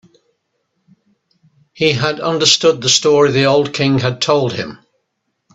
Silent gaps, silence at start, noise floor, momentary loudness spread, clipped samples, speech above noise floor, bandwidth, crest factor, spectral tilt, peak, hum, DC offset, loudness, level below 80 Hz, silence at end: none; 1.75 s; -71 dBFS; 7 LU; under 0.1%; 57 dB; 8.4 kHz; 16 dB; -3.5 dB/octave; 0 dBFS; none; under 0.1%; -13 LUFS; -54 dBFS; 0.8 s